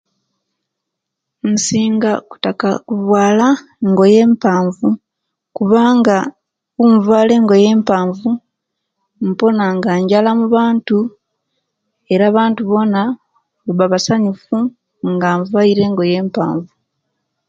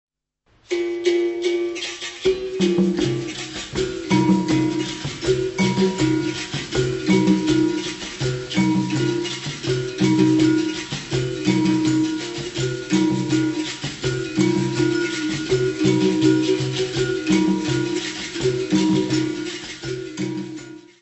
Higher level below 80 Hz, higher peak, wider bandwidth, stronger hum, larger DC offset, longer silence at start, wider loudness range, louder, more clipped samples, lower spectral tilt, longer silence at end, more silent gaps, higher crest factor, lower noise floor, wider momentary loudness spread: second, -58 dBFS vs -48 dBFS; first, 0 dBFS vs -4 dBFS; about the same, 9 kHz vs 8.4 kHz; neither; neither; first, 1.45 s vs 0.7 s; about the same, 4 LU vs 2 LU; first, -14 LUFS vs -21 LUFS; neither; about the same, -6 dB/octave vs -5.5 dB/octave; first, 0.85 s vs 0.2 s; neither; about the same, 14 dB vs 18 dB; first, -78 dBFS vs -63 dBFS; about the same, 11 LU vs 10 LU